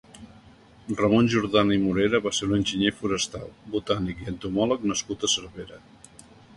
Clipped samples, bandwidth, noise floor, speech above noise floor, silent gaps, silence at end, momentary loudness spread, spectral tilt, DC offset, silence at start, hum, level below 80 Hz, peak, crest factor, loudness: under 0.1%; 11.5 kHz; -52 dBFS; 27 dB; none; 0.8 s; 13 LU; -4.5 dB/octave; under 0.1%; 0.15 s; none; -50 dBFS; -6 dBFS; 18 dB; -25 LUFS